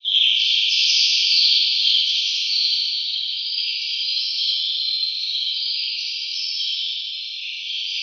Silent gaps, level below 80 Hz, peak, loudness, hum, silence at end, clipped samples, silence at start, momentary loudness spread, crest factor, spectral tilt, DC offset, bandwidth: none; under -90 dBFS; -4 dBFS; -18 LUFS; none; 0 s; under 0.1%; 0.05 s; 9 LU; 18 dB; 14.5 dB/octave; under 0.1%; 7.4 kHz